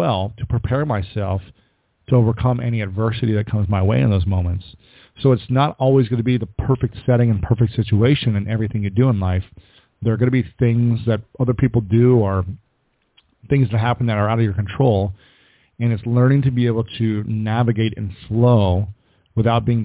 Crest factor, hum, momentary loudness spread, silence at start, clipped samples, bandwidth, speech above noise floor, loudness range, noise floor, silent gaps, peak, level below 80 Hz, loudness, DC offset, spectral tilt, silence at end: 14 dB; none; 8 LU; 0 s; under 0.1%; 4 kHz; 49 dB; 2 LU; -66 dBFS; none; -4 dBFS; -36 dBFS; -19 LUFS; under 0.1%; -12 dB/octave; 0 s